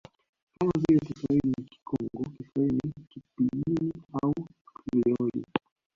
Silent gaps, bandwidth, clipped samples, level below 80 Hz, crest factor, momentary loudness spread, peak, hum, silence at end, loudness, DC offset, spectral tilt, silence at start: 4.61-4.65 s; 7.4 kHz; under 0.1%; -56 dBFS; 20 dB; 12 LU; -8 dBFS; none; 0.4 s; -29 LUFS; under 0.1%; -9 dB/octave; 0.6 s